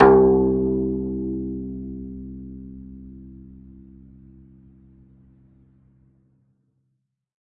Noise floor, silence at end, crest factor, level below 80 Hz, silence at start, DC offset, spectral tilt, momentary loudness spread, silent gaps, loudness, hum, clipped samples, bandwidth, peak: -74 dBFS; 4.2 s; 24 dB; -42 dBFS; 0 s; under 0.1%; -11 dB/octave; 27 LU; none; -22 LUFS; none; under 0.1%; 3.6 kHz; -2 dBFS